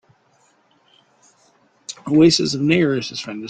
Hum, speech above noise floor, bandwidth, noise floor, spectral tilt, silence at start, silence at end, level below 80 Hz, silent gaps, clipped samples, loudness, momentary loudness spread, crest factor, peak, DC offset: none; 42 dB; 9.2 kHz; -59 dBFS; -5 dB/octave; 1.9 s; 0 s; -56 dBFS; none; under 0.1%; -17 LUFS; 20 LU; 18 dB; -2 dBFS; under 0.1%